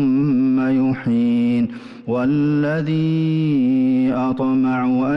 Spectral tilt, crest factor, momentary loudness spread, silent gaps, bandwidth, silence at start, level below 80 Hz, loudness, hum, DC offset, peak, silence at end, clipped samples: -9.5 dB/octave; 6 dB; 3 LU; none; 5.8 kHz; 0 s; -54 dBFS; -18 LUFS; none; under 0.1%; -12 dBFS; 0 s; under 0.1%